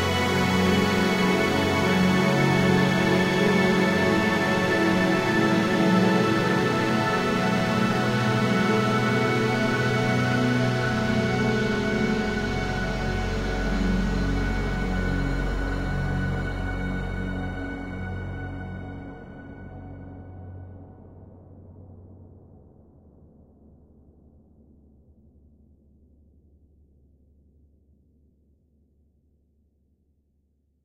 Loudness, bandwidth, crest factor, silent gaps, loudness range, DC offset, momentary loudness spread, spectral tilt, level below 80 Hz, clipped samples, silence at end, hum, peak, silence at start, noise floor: -23 LUFS; 16 kHz; 16 dB; none; 17 LU; under 0.1%; 15 LU; -6 dB/octave; -38 dBFS; under 0.1%; 8.45 s; none; -8 dBFS; 0 s; -68 dBFS